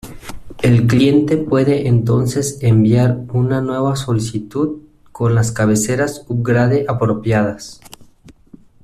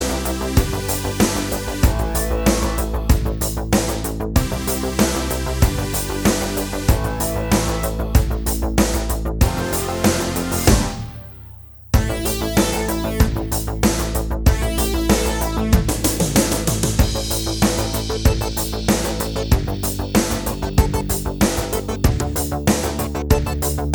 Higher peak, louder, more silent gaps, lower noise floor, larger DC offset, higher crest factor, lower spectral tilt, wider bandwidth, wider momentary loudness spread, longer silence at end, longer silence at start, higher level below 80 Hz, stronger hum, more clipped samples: about the same, -2 dBFS vs 0 dBFS; first, -16 LUFS vs -20 LUFS; neither; first, -45 dBFS vs -39 dBFS; neither; about the same, 14 dB vs 18 dB; first, -6.5 dB/octave vs -4.5 dB/octave; second, 14 kHz vs over 20 kHz; first, 10 LU vs 5 LU; first, 0.55 s vs 0 s; about the same, 0.05 s vs 0 s; second, -42 dBFS vs -24 dBFS; neither; neither